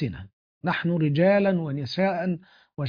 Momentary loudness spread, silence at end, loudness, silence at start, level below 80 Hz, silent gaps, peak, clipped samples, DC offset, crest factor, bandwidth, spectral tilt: 14 LU; 0 s; -25 LUFS; 0 s; -58 dBFS; 0.33-0.61 s; -8 dBFS; under 0.1%; under 0.1%; 16 dB; 5.2 kHz; -8.5 dB/octave